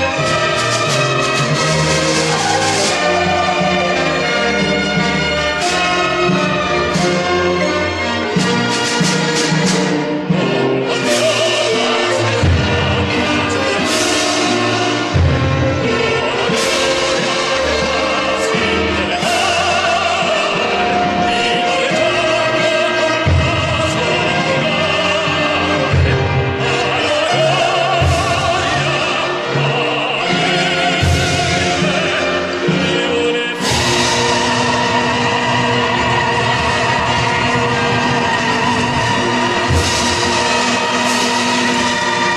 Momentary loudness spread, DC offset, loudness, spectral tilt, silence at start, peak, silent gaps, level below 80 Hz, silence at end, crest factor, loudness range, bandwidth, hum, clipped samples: 2 LU; under 0.1%; -14 LUFS; -4 dB/octave; 0 s; -2 dBFS; none; -38 dBFS; 0 s; 12 dB; 1 LU; 14 kHz; none; under 0.1%